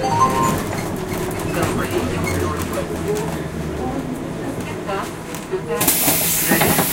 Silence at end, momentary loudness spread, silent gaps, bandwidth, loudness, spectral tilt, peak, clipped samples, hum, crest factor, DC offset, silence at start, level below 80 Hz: 0 s; 12 LU; none; 17 kHz; -20 LUFS; -4 dB/octave; 0 dBFS; under 0.1%; none; 20 dB; under 0.1%; 0 s; -38 dBFS